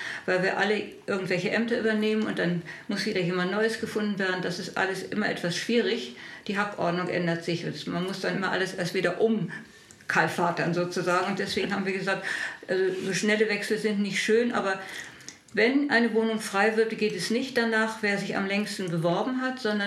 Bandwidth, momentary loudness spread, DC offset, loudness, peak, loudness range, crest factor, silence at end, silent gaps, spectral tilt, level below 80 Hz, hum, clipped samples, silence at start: 14 kHz; 8 LU; under 0.1%; -27 LUFS; -8 dBFS; 3 LU; 18 dB; 0 s; none; -5 dB/octave; -70 dBFS; none; under 0.1%; 0 s